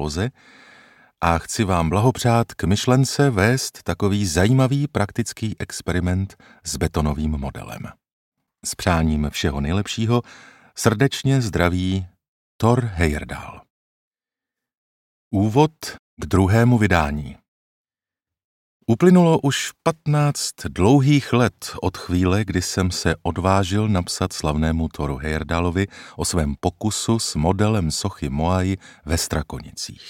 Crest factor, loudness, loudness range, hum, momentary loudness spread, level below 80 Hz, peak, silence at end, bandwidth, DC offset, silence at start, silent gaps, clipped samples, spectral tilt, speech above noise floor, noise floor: 20 dB; -21 LUFS; 6 LU; none; 12 LU; -36 dBFS; -2 dBFS; 0 s; 16.5 kHz; under 0.1%; 0 s; 8.13-8.32 s, 12.28-12.59 s, 13.70-14.11 s, 14.77-15.31 s, 15.99-16.17 s, 17.48-17.85 s, 18.44-18.80 s; under 0.1%; -5.5 dB/octave; 69 dB; -89 dBFS